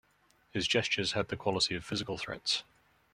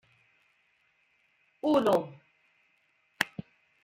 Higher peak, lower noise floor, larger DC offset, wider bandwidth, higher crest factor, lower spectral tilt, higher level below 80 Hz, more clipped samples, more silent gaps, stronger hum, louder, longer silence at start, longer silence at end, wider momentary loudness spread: second, -14 dBFS vs -8 dBFS; about the same, -69 dBFS vs -71 dBFS; neither; second, 14 kHz vs 15.5 kHz; second, 20 dB vs 26 dB; second, -3 dB/octave vs -5 dB/octave; first, -62 dBFS vs -74 dBFS; neither; neither; neither; second, -32 LUFS vs -29 LUFS; second, 0.55 s vs 1.65 s; about the same, 0.5 s vs 0.45 s; second, 7 LU vs 18 LU